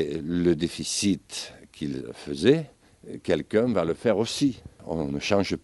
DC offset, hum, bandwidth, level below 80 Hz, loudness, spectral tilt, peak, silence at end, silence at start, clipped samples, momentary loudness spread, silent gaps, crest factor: under 0.1%; none; 11.5 kHz; -54 dBFS; -26 LUFS; -5 dB/octave; -6 dBFS; 0.05 s; 0 s; under 0.1%; 13 LU; none; 20 dB